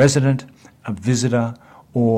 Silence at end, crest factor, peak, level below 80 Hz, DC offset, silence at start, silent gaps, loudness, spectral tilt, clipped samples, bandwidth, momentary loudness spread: 0 s; 16 dB; -4 dBFS; -56 dBFS; under 0.1%; 0 s; none; -20 LUFS; -6 dB/octave; under 0.1%; 12.5 kHz; 15 LU